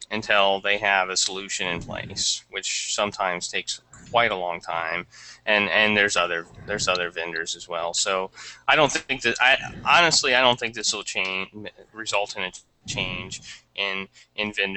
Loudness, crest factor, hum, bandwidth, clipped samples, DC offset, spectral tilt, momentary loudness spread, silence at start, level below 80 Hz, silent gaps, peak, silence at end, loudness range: -23 LUFS; 22 dB; none; 9 kHz; under 0.1%; under 0.1%; -1.5 dB/octave; 14 LU; 0 s; -54 dBFS; none; -2 dBFS; 0 s; 7 LU